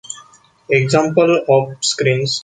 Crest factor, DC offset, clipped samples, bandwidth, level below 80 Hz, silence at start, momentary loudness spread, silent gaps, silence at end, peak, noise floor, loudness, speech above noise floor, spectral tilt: 14 dB; under 0.1%; under 0.1%; 9.6 kHz; -58 dBFS; 0.1 s; 8 LU; none; 0.05 s; -2 dBFS; -46 dBFS; -15 LUFS; 31 dB; -4.5 dB/octave